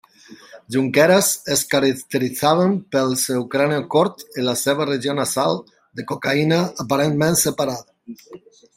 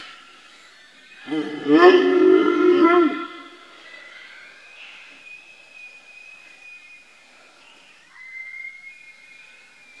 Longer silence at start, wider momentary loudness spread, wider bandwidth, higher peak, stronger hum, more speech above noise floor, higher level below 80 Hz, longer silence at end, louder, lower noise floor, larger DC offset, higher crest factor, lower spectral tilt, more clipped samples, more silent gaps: first, 0.3 s vs 0 s; second, 9 LU vs 28 LU; first, 16 kHz vs 7.6 kHz; about the same, -2 dBFS vs 0 dBFS; neither; second, 26 dB vs 35 dB; first, -60 dBFS vs -76 dBFS; second, 0.4 s vs 1.1 s; second, -19 LUFS vs -16 LUFS; second, -45 dBFS vs -51 dBFS; neither; about the same, 18 dB vs 22 dB; about the same, -4 dB/octave vs -5 dB/octave; neither; neither